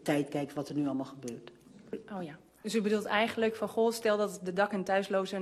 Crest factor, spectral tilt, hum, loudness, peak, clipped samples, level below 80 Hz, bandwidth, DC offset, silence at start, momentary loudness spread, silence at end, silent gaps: 18 dB; -5 dB/octave; none; -32 LUFS; -14 dBFS; under 0.1%; -74 dBFS; 13.5 kHz; under 0.1%; 0 s; 15 LU; 0 s; none